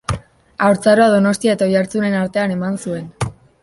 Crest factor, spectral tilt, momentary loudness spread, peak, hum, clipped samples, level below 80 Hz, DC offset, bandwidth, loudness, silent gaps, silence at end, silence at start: 14 dB; -6 dB/octave; 14 LU; -2 dBFS; none; under 0.1%; -42 dBFS; under 0.1%; 11.5 kHz; -16 LUFS; none; 0.3 s; 0.1 s